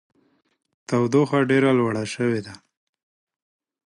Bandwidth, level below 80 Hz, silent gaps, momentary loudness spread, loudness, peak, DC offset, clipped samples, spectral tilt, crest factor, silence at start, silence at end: 11.5 kHz; -64 dBFS; none; 9 LU; -21 LUFS; -6 dBFS; under 0.1%; under 0.1%; -6.5 dB/octave; 18 dB; 0.9 s; 1.3 s